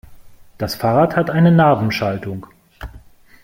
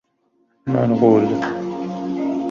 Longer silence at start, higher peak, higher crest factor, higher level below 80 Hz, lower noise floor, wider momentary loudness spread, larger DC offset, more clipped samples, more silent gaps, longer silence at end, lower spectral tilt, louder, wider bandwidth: second, 0.1 s vs 0.65 s; about the same, -2 dBFS vs -2 dBFS; about the same, 16 dB vs 18 dB; first, -44 dBFS vs -58 dBFS; second, -43 dBFS vs -64 dBFS; first, 25 LU vs 12 LU; neither; neither; neither; first, 0.45 s vs 0 s; about the same, -7.5 dB/octave vs -8.5 dB/octave; first, -16 LUFS vs -19 LUFS; first, 16 kHz vs 7.2 kHz